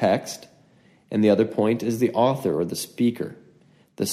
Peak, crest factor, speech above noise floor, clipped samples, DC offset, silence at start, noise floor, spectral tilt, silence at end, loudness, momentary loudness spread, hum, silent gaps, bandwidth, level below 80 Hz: -6 dBFS; 18 dB; 35 dB; under 0.1%; under 0.1%; 0 s; -57 dBFS; -5.5 dB/octave; 0 s; -23 LUFS; 14 LU; none; none; 15.5 kHz; -66 dBFS